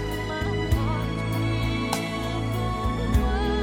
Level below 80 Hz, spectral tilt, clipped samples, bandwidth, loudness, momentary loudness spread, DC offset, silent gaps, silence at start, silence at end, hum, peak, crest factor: -30 dBFS; -6 dB/octave; under 0.1%; 17 kHz; -26 LUFS; 4 LU; under 0.1%; none; 0 s; 0 s; none; -10 dBFS; 16 dB